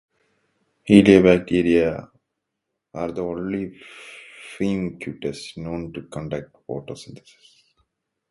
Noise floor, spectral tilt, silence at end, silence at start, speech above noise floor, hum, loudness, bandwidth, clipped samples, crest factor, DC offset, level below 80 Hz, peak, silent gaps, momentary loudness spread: -80 dBFS; -7 dB/octave; 1.15 s; 0.85 s; 60 dB; none; -20 LUFS; 11.5 kHz; under 0.1%; 22 dB; under 0.1%; -50 dBFS; 0 dBFS; none; 25 LU